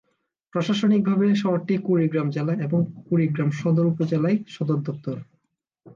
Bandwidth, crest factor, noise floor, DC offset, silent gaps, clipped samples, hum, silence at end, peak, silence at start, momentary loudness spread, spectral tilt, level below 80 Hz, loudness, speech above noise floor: 7.4 kHz; 12 dB; -75 dBFS; under 0.1%; none; under 0.1%; none; 0.05 s; -12 dBFS; 0.55 s; 8 LU; -8 dB/octave; -66 dBFS; -23 LUFS; 53 dB